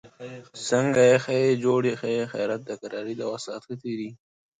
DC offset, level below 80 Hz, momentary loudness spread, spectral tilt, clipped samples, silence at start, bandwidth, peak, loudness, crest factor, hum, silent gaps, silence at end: under 0.1%; -68 dBFS; 16 LU; -5.5 dB/octave; under 0.1%; 0.05 s; 9.6 kHz; -6 dBFS; -25 LUFS; 18 dB; none; none; 0.45 s